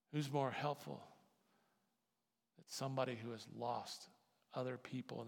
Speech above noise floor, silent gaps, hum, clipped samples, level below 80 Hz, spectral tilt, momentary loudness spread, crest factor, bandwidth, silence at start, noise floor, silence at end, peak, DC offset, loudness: 45 dB; none; none; under 0.1%; under -90 dBFS; -5.5 dB/octave; 13 LU; 20 dB; 17.5 kHz; 0.1 s; -90 dBFS; 0 s; -26 dBFS; under 0.1%; -45 LUFS